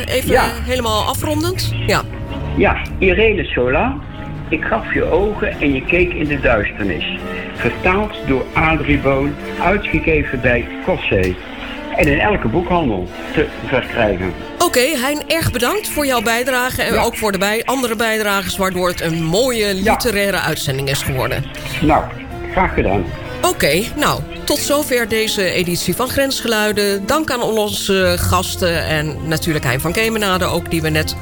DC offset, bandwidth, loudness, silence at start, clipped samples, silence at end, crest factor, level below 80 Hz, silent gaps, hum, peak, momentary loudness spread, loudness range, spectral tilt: 0.6%; 18 kHz; -17 LUFS; 0 s; under 0.1%; 0 s; 14 dB; -30 dBFS; none; none; -4 dBFS; 6 LU; 1 LU; -4.5 dB/octave